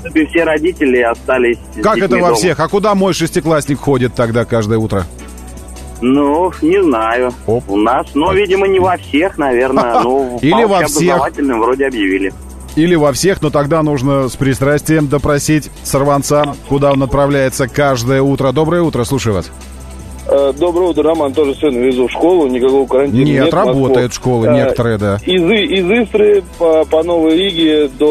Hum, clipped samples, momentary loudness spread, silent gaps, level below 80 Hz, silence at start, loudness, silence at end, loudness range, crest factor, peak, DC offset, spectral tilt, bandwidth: none; under 0.1%; 5 LU; none; -34 dBFS; 0 s; -12 LUFS; 0 s; 3 LU; 12 dB; 0 dBFS; 0.2%; -5.5 dB/octave; 13.5 kHz